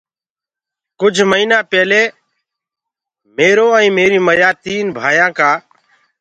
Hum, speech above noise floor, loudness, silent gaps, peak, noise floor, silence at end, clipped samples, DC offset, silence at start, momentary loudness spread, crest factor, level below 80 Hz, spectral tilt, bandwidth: none; over 78 dB; -12 LUFS; none; 0 dBFS; under -90 dBFS; 0.6 s; under 0.1%; under 0.1%; 1 s; 8 LU; 14 dB; -58 dBFS; -4 dB/octave; 9.2 kHz